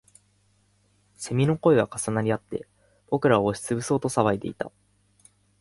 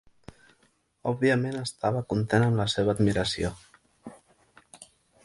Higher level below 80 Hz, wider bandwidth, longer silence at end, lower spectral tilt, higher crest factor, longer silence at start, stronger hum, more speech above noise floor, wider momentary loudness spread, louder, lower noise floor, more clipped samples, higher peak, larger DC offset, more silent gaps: second, -58 dBFS vs -52 dBFS; about the same, 11.5 kHz vs 11.5 kHz; first, 0.9 s vs 0.4 s; about the same, -6 dB/octave vs -6 dB/octave; about the same, 22 dB vs 20 dB; first, 1.2 s vs 1.05 s; first, 50 Hz at -50 dBFS vs none; about the same, 41 dB vs 42 dB; second, 15 LU vs 23 LU; about the same, -25 LUFS vs -27 LUFS; about the same, -65 dBFS vs -68 dBFS; neither; first, -4 dBFS vs -8 dBFS; neither; neither